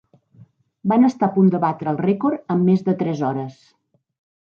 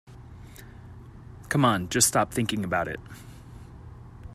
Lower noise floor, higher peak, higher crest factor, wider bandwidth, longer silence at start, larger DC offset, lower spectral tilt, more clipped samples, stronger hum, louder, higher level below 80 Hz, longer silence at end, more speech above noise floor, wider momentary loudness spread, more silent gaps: first, -51 dBFS vs -45 dBFS; about the same, -6 dBFS vs -4 dBFS; second, 16 dB vs 26 dB; second, 6.8 kHz vs 15.5 kHz; first, 0.4 s vs 0.1 s; neither; first, -9.5 dB/octave vs -3.5 dB/octave; neither; neither; first, -19 LUFS vs -24 LUFS; second, -68 dBFS vs -50 dBFS; first, 1 s vs 0 s; first, 32 dB vs 20 dB; second, 8 LU vs 25 LU; neither